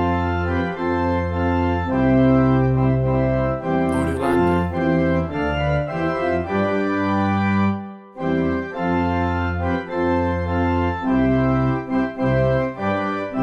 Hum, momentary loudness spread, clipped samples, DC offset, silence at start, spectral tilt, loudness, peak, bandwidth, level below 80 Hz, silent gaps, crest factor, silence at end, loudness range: none; 5 LU; under 0.1%; under 0.1%; 0 s; -8.5 dB/octave; -20 LUFS; -4 dBFS; 11.5 kHz; -36 dBFS; none; 14 dB; 0 s; 3 LU